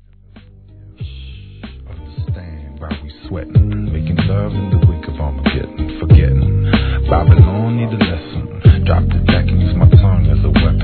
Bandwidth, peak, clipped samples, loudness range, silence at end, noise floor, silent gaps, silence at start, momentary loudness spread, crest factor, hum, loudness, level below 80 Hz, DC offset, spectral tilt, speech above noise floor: 4.5 kHz; 0 dBFS; 0.3%; 10 LU; 0 s; -42 dBFS; none; 0.35 s; 21 LU; 14 dB; none; -14 LUFS; -20 dBFS; 0.3%; -11 dB/octave; 29 dB